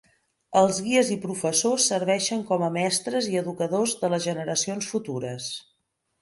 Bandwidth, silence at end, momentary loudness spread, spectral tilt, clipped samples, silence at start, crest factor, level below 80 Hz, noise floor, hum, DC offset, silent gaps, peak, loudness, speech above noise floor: 12 kHz; 0.6 s; 9 LU; -3.5 dB/octave; under 0.1%; 0.5 s; 18 dB; -68 dBFS; -75 dBFS; none; under 0.1%; none; -6 dBFS; -25 LUFS; 50 dB